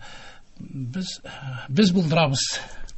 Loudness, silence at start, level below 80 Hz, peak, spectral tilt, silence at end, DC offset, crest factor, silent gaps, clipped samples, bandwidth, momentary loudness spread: -23 LUFS; 0 s; -48 dBFS; -6 dBFS; -5 dB/octave; 0 s; under 0.1%; 18 dB; none; under 0.1%; 8.6 kHz; 22 LU